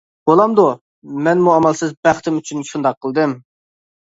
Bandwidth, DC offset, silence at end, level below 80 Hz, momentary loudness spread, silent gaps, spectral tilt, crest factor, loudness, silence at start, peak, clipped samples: 8 kHz; under 0.1%; 0.75 s; -58 dBFS; 12 LU; 0.81-1.02 s, 1.97-2.03 s, 2.97-3.01 s; -6 dB/octave; 16 dB; -16 LUFS; 0.25 s; 0 dBFS; under 0.1%